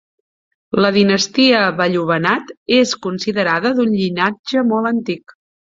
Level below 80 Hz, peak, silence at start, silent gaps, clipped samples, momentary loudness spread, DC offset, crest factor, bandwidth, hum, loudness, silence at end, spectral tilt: -58 dBFS; -2 dBFS; 0.75 s; 2.57-2.66 s, 4.39-4.44 s; under 0.1%; 8 LU; under 0.1%; 16 dB; 7.8 kHz; none; -16 LUFS; 0.5 s; -4.5 dB/octave